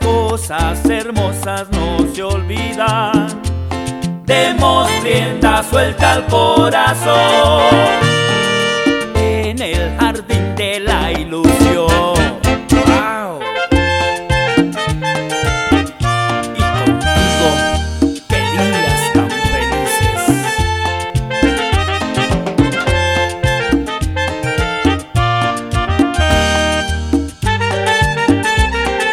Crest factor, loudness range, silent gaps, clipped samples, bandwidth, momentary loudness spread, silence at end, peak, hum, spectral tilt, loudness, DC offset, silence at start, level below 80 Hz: 14 dB; 4 LU; none; under 0.1%; 16.5 kHz; 7 LU; 0 s; 0 dBFS; none; -5 dB/octave; -14 LUFS; under 0.1%; 0 s; -24 dBFS